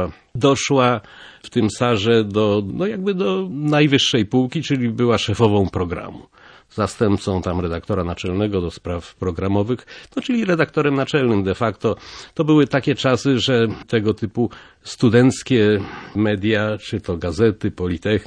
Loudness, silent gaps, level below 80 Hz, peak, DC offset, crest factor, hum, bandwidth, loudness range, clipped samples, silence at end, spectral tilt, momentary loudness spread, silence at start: -19 LUFS; none; -46 dBFS; 0 dBFS; under 0.1%; 18 dB; none; 10.5 kHz; 4 LU; under 0.1%; 0 s; -6 dB/octave; 10 LU; 0 s